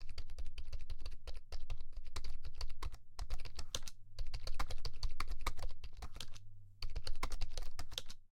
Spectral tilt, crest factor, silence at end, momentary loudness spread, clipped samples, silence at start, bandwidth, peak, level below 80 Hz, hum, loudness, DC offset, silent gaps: -3 dB/octave; 14 dB; 0.1 s; 7 LU; under 0.1%; 0 s; 10 kHz; -20 dBFS; -42 dBFS; none; -49 LUFS; under 0.1%; none